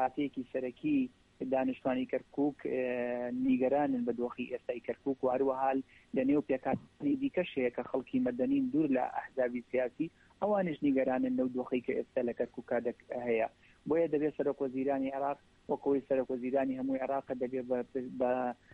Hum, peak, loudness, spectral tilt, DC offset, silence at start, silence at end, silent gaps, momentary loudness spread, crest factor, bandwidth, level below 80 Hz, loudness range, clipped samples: none; -20 dBFS; -34 LUFS; -8.5 dB/octave; under 0.1%; 0 s; 0.2 s; none; 7 LU; 14 dB; 4.3 kHz; -68 dBFS; 2 LU; under 0.1%